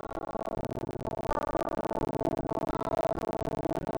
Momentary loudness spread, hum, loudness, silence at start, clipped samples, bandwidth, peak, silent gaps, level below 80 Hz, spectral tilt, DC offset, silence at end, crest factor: 5 LU; none; -33 LUFS; 0.05 s; under 0.1%; over 20 kHz; -16 dBFS; none; -46 dBFS; -7 dB/octave; under 0.1%; 0 s; 16 dB